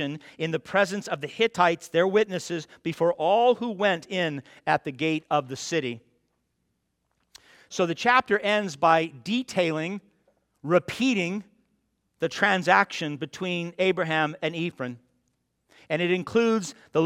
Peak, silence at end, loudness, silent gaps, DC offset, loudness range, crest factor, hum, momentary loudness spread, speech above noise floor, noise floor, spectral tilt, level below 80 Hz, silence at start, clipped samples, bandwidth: -4 dBFS; 0 s; -25 LUFS; none; under 0.1%; 5 LU; 22 dB; none; 11 LU; 51 dB; -76 dBFS; -5 dB/octave; -70 dBFS; 0 s; under 0.1%; 15 kHz